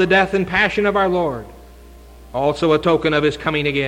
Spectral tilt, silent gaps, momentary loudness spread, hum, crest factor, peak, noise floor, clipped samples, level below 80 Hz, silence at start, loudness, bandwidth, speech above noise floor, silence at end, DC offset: -6 dB/octave; none; 7 LU; none; 14 dB; -4 dBFS; -41 dBFS; under 0.1%; -42 dBFS; 0 s; -17 LUFS; 16 kHz; 24 dB; 0 s; under 0.1%